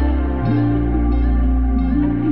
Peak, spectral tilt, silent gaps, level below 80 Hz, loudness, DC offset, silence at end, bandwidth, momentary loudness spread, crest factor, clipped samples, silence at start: -6 dBFS; -12 dB/octave; none; -18 dBFS; -18 LUFS; 2%; 0 s; 4.5 kHz; 2 LU; 10 dB; under 0.1%; 0 s